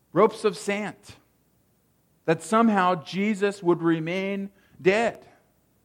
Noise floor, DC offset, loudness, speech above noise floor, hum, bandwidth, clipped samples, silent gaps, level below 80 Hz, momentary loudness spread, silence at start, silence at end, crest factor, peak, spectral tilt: -66 dBFS; under 0.1%; -24 LUFS; 42 dB; none; 16 kHz; under 0.1%; none; -70 dBFS; 10 LU; 0.15 s; 0.7 s; 20 dB; -6 dBFS; -6 dB/octave